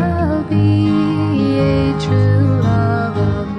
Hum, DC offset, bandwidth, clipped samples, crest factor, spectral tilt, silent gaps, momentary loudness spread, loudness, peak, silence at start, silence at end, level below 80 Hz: none; 0.1%; 8.2 kHz; under 0.1%; 10 dB; -8.5 dB/octave; none; 4 LU; -15 LUFS; -4 dBFS; 0 s; 0 s; -32 dBFS